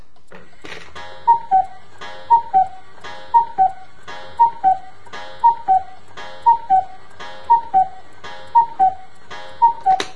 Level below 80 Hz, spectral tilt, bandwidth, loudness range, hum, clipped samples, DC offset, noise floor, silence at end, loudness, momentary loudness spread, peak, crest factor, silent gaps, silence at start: -58 dBFS; -3 dB/octave; 10.5 kHz; 1 LU; none; under 0.1%; 3%; -45 dBFS; 0.05 s; -17 LUFS; 22 LU; -2 dBFS; 16 dB; none; 0.7 s